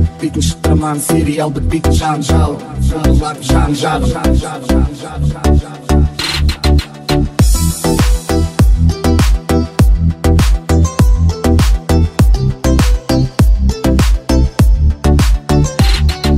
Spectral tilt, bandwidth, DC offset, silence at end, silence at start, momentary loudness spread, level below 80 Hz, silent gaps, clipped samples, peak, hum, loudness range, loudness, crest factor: -6 dB/octave; 16 kHz; under 0.1%; 0 s; 0 s; 4 LU; -14 dBFS; none; under 0.1%; 0 dBFS; none; 2 LU; -13 LUFS; 10 dB